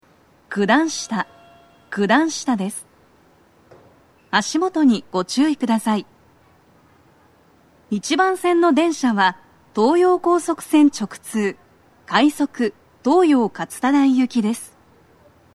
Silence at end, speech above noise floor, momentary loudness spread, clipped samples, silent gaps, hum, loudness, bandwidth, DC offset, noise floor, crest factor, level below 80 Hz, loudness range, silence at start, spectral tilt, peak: 0.9 s; 37 dB; 11 LU; under 0.1%; none; none; -19 LUFS; 13.5 kHz; under 0.1%; -55 dBFS; 20 dB; -66 dBFS; 5 LU; 0.5 s; -4.5 dB/octave; 0 dBFS